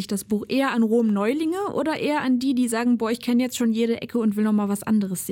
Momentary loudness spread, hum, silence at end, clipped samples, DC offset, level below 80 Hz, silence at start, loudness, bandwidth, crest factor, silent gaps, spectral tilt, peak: 4 LU; none; 0 s; under 0.1%; under 0.1%; -62 dBFS; 0 s; -23 LUFS; 17 kHz; 10 dB; none; -5.5 dB/octave; -12 dBFS